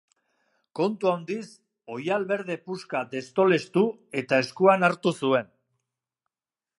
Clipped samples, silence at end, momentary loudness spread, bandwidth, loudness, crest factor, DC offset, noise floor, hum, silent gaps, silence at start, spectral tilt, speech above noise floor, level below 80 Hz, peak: under 0.1%; 1.35 s; 14 LU; 11.5 kHz; -25 LUFS; 22 dB; under 0.1%; under -90 dBFS; none; none; 0.75 s; -6 dB/octave; over 65 dB; -78 dBFS; -6 dBFS